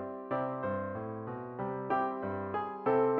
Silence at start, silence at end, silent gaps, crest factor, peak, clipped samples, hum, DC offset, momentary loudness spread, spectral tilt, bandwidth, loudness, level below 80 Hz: 0 s; 0 s; none; 18 dB; -16 dBFS; under 0.1%; none; under 0.1%; 8 LU; -6.5 dB/octave; 4.6 kHz; -35 LUFS; -72 dBFS